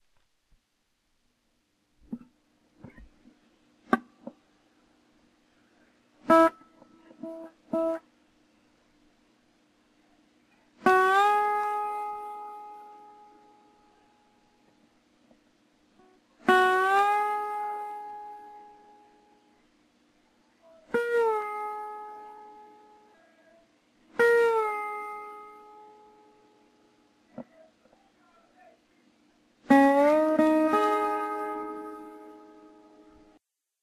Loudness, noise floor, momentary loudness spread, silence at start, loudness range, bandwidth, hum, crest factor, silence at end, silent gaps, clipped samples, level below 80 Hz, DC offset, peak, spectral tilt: -26 LUFS; -75 dBFS; 26 LU; 2.1 s; 14 LU; 14 kHz; none; 24 dB; 1.45 s; none; under 0.1%; -70 dBFS; under 0.1%; -6 dBFS; -4.5 dB/octave